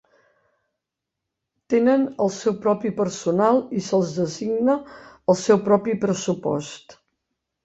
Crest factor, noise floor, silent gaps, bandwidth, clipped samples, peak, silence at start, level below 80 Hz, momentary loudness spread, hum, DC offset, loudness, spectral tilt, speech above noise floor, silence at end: 18 dB; -84 dBFS; none; 8.2 kHz; under 0.1%; -4 dBFS; 1.7 s; -64 dBFS; 8 LU; none; under 0.1%; -22 LUFS; -6 dB/octave; 63 dB; 0.75 s